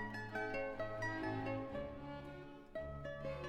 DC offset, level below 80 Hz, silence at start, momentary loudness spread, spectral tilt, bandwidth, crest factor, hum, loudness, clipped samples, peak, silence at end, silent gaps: under 0.1%; -58 dBFS; 0 s; 9 LU; -6.5 dB/octave; 14 kHz; 14 dB; none; -45 LUFS; under 0.1%; -30 dBFS; 0 s; none